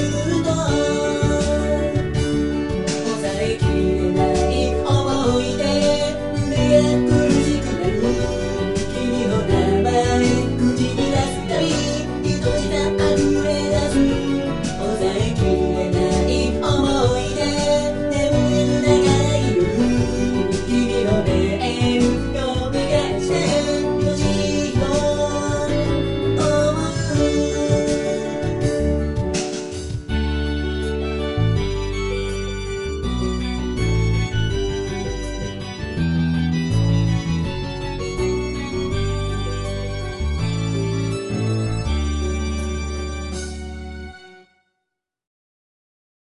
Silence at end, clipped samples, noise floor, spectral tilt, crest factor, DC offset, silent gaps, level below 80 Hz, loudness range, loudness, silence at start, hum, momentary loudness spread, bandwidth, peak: 1.1 s; under 0.1%; -79 dBFS; -6 dB/octave; 18 dB; 0.8%; none; -30 dBFS; 6 LU; -20 LUFS; 0 s; none; 8 LU; 11.5 kHz; -2 dBFS